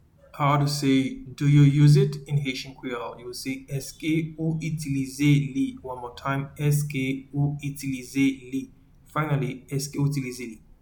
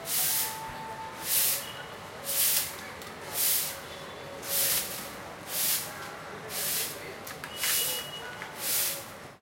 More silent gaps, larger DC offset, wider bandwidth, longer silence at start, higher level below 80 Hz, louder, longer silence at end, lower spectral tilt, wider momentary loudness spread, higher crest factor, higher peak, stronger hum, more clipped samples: neither; neither; first, 19 kHz vs 16.5 kHz; first, 0.35 s vs 0 s; first, -52 dBFS vs -64 dBFS; first, -25 LUFS vs -28 LUFS; first, 0.25 s vs 0.05 s; first, -6.5 dB/octave vs 0 dB/octave; about the same, 15 LU vs 16 LU; about the same, 18 dB vs 20 dB; first, -8 dBFS vs -12 dBFS; neither; neither